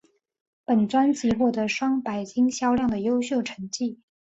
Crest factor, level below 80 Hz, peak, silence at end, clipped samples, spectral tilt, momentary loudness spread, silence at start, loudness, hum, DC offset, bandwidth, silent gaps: 14 dB; -56 dBFS; -10 dBFS; 0.35 s; under 0.1%; -5 dB/octave; 8 LU; 0.7 s; -24 LUFS; none; under 0.1%; 8 kHz; none